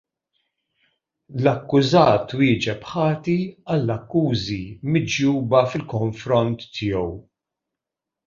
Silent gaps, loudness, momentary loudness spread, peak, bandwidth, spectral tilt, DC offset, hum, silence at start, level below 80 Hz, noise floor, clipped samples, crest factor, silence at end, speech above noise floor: none; -21 LUFS; 9 LU; -2 dBFS; 7.4 kHz; -6.5 dB/octave; under 0.1%; none; 1.3 s; -50 dBFS; -86 dBFS; under 0.1%; 20 dB; 1.05 s; 66 dB